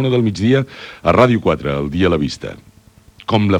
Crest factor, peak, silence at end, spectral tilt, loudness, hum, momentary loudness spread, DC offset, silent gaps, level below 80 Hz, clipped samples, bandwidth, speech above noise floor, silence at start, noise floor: 16 dB; 0 dBFS; 0 s; -7 dB/octave; -16 LUFS; none; 16 LU; under 0.1%; none; -42 dBFS; under 0.1%; 11 kHz; 32 dB; 0 s; -47 dBFS